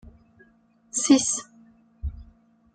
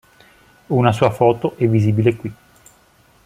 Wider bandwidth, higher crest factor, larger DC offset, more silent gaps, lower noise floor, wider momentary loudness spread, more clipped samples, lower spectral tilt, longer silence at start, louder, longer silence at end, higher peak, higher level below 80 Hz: second, 9.4 kHz vs 13 kHz; about the same, 22 dB vs 18 dB; neither; neither; first, -61 dBFS vs -53 dBFS; first, 18 LU vs 8 LU; neither; second, -3 dB/octave vs -8 dB/octave; second, 0.05 s vs 0.7 s; second, -22 LUFS vs -17 LUFS; second, 0.5 s vs 0.9 s; second, -6 dBFS vs 0 dBFS; first, -44 dBFS vs -52 dBFS